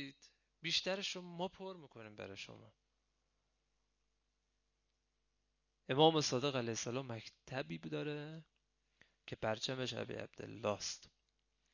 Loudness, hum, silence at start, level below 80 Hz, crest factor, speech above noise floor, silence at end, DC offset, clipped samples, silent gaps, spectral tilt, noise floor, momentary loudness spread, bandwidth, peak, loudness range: -39 LUFS; 50 Hz at -80 dBFS; 0 s; -74 dBFS; 28 dB; 44 dB; 0.65 s; under 0.1%; under 0.1%; none; -4 dB/octave; -85 dBFS; 18 LU; 7.4 kHz; -16 dBFS; 17 LU